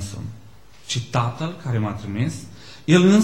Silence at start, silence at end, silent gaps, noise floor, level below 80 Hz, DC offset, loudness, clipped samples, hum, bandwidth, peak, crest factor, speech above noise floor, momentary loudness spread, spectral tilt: 0 s; 0 s; none; -48 dBFS; -54 dBFS; 0.6%; -23 LUFS; under 0.1%; none; 12.5 kHz; -2 dBFS; 20 dB; 29 dB; 20 LU; -6 dB/octave